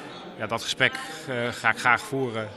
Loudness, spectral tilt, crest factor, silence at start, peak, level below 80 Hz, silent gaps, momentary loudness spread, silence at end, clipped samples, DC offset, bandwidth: -25 LUFS; -3.5 dB/octave; 24 dB; 0 s; -4 dBFS; -64 dBFS; none; 12 LU; 0 s; under 0.1%; under 0.1%; 14 kHz